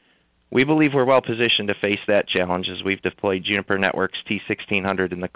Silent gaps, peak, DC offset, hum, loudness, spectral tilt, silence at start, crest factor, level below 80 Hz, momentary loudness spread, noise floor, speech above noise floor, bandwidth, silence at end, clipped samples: none; -6 dBFS; under 0.1%; none; -21 LUFS; -9 dB/octave; 0.5 s; 16 dB; -52 dBFS; 7 LU; -62 dBFS; 41 dB; 4 kHz; 0.1 s; under 0.1%